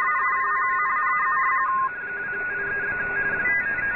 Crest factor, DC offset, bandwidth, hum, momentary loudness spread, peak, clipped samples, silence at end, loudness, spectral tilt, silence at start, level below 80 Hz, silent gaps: 10 dB; 0.1%; 4 kHz; none; 6 LU; -14 dBFS; under 0.1%; 0 s; -23 LUFS; -3 dB/octave; 0 s; -54 dBFS; none